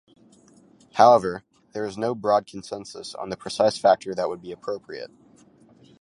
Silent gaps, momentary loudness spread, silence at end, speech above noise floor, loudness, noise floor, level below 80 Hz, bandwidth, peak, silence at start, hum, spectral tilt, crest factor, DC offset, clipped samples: none; 21 LU; 0.95 s; 32 dB; -23 LUFS; -55 dBFS; -64 dBFS; 11.5 kHz; -2 dBFS; 0.95 s; none; -4.5 dB/octave; 22 dB; under 0.1%; under 0.1%